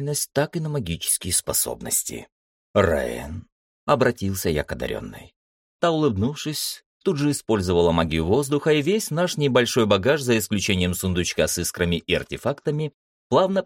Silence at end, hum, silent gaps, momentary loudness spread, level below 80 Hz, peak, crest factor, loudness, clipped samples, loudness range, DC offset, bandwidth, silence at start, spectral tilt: 0 s; none; 2.32-2.74 s, 3.52-3.87 s, 5.36-5.79 s, 6.86-7.00 s, 12.94-13.30 s; 9 LU; -44 dBFS; -6 dBFS; 18 dB; -23 LUFS; under 0.1%; 5 LU; under 0.1%; 17 kHz; 0 s; -4.5 dB/octave